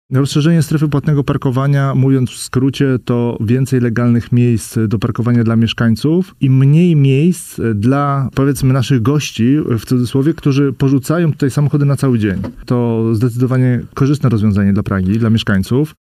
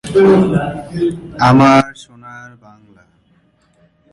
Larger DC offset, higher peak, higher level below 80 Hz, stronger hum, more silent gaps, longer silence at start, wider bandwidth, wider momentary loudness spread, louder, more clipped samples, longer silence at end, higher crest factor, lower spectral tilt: neither; about the same, -2 dBFS vs 0 dBFS; about the same, -42 dBFS vs -44 dBFS; neither; neither; about the same, 0.1 s vs 0.05 s; first, 15 kHz vs 11.5 kHz; second, 4 LU vs 25 LU; about the same, -14 LUFS vs -12 LUFS; neither; second, 0.15 s vs 1.65 s; about the same, 12 dB vs 14 dB; about the same, -7 dB/octave vs -7 dB/octave